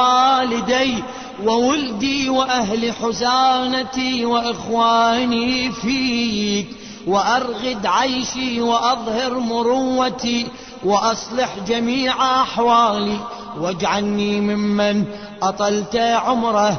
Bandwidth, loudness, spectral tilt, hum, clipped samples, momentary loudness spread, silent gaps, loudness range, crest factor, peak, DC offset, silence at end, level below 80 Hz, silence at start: 6.6 kHz; -18 LUFS; -4 dB/octave; none; under 0.1%; 8 LU; none; 2 LU; 14 dB; -4 dBFS; 0.2%; 0 s; -50 dBFS; 0 s